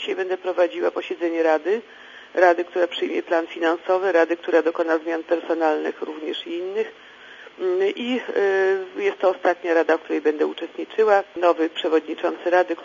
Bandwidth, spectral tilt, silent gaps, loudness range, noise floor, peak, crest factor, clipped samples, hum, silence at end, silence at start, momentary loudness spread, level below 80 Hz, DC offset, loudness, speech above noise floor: 7.4 kHz; -4 dB/octave; none; 4 LU; -44 dBFS; -4 dBFS; 18 dB; under 0.1%; none; 0 s; 0 s; 10 LU; -76 dBFS; under 0.1%; -22 LUFS; 22 dB